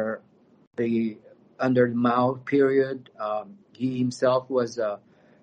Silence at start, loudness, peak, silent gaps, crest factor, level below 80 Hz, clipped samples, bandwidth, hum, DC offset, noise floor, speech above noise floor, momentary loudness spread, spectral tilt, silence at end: 0 s; -25 LUFS; -8 dBFS; 0.67-0.71 s; 18 dB; -68 dBFS; under 0.1%; 9.4 kHz; none; under 0.1%; -55 dBFS; 31 dB; 12 LU; -7 dB/octave; 0.45 s